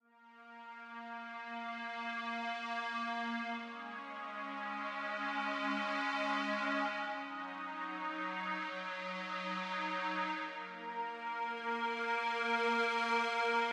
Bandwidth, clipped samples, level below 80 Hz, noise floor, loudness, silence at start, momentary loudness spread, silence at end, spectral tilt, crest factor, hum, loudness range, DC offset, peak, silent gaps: 12 kHz; under 0.1%; under -90 dBFS; -60 dBFS; -38 LUFS; 0.2 s; 11 LU; 0 s; -3.5 dB/octave; 18 dB; none; 4 LU; under 0.1%; -22 dBFS; none